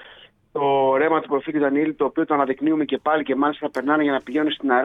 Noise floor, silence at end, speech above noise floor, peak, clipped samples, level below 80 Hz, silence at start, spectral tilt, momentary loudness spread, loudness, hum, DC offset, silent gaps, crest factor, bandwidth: -49 dBFS; 0 s; 28 dB; -4 dBFS; under 0.1%; -64 dBFS; 0 s; -7 dB/octave; 5 LU; -21 LUFS; none; under 0.1%; none; 18 dB; 5.6 kHz